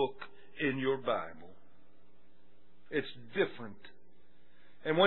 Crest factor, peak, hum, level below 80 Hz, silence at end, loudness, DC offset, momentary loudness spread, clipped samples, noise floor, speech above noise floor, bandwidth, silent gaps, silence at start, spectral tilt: 24 dB; -12 dBFS; none; -76 dBFS; 0 s; -36 LUFS; 0.6%; 19 LU; under 0.1%; -68 dBFS; 33 dB; 4.2 kHz; none; 0 s; -3 dB/octave